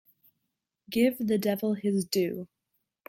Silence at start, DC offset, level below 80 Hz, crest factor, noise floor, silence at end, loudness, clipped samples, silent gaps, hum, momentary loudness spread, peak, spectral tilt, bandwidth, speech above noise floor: 0.9 s; under 0.1%; -70 dBFS; 18 dB; -83 dBFS; 0.65 s; -28 LUFS; under 0.1%; none; none; 9 LU; -12 dBFS; -5.5 dB/octave; 16.5 kHz; 56 dB